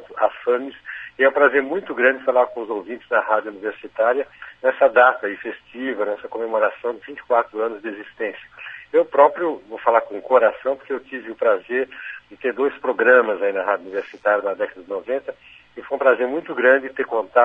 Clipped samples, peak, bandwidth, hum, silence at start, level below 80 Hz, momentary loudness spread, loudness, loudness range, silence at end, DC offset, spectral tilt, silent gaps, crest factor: under 0.1%; -2 dBFS; 3.9 kHz; none; 0 s; -66 dBFS; 16 LU; -20 LUFS; 3 LU; 0 s; under 0.1%; -6 dB/octave; none; 18 dB